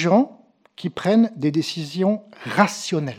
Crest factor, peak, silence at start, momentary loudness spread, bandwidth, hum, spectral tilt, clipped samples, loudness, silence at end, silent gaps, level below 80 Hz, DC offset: 22 dB; 0 dBFS; 0 s; 9 LU; 13.5 kHz; none; -5.5 dB/octave; under 0.1%; -21 LUFS; 0 s; none; -68 dBFS; under 0.1%